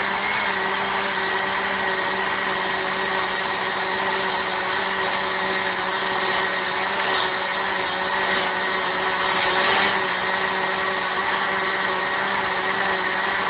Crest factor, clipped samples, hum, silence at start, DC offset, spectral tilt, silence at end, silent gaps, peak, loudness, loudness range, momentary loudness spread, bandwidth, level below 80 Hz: 16 dB; under 0.1%; none; 0 s; under 0.1%; -7.5 dB/octave; 0 s; none; -6 dBFS; -22 LUFS; 2 LU; 3 LU; 5.2 kHz; -56 dBFS